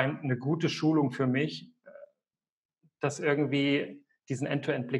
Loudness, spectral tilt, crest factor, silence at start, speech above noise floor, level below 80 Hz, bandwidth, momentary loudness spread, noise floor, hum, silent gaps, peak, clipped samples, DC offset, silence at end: -30 LUFS; -6 dB/octave; 22 dB; 0 s; over 61 dB; -78 dBFS; 11.5 kHz; 8 LU; under -90 dBFS; none; 2.52-2.69 s; -10 dBFS; under 0.1%; under 0.1%; 0 s